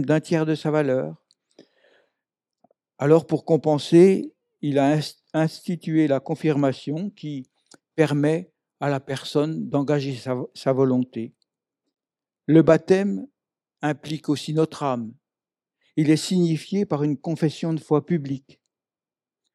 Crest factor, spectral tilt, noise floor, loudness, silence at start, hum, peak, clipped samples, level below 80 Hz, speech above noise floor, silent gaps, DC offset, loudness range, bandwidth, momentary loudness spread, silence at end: 20 dB; -7 dB/octave; under -90 dBFS; -22 LUFS; 0 s; none; -4 dBFS; under 0.1%; -68 dBFS; over 69 dB; none; under 0.1%; 5 LU; 12.5 kHz; 13 LU; 1.15 s